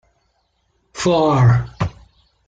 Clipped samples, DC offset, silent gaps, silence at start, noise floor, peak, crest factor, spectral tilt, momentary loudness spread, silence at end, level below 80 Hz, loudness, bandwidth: under 0.1%; under 0.1%; none; 0.95 s; -65 dBFS; -4 dBFS; 16 dB; -6.5 dB/octave; 13 LU; 0.55 s; -42 dBFS; -17 LUFS; 9 kHz